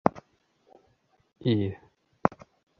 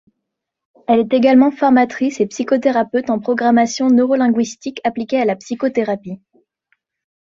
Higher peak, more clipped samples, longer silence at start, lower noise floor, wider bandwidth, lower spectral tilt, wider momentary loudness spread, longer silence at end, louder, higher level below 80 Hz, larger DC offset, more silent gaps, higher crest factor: about the same, -2 dBFS vs -2 dBFS; neither; second, 0.05 s vs 0.9 s; second, -68 dBFS vs -78 dBFS; second, 6.6 kHz vs 7.6 kHz; first, -8.5 dB/octave vs -5 dB/octave; first, 18 LU vs 10 LU; second, 0.5 s vs 1.05 s; second, -30 LUFS vs -16 LUFS; first, -56 dBFS vs -62 dBFS; neither; neither; first, 30 dB vs 16 dB